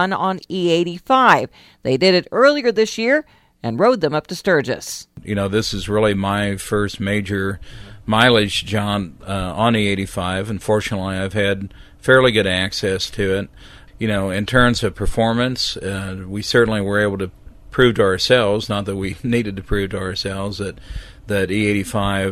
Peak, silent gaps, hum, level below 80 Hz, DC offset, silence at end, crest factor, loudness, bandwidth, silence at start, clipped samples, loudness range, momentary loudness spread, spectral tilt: 0 dBFS; none; none; -38 dBFS; under 0.1%; 0 s; 18 dB; -18 LUFS; 15.5 kHz; 0 s; under 0.1%; 4 LU; 12 LU; -5 dB/octave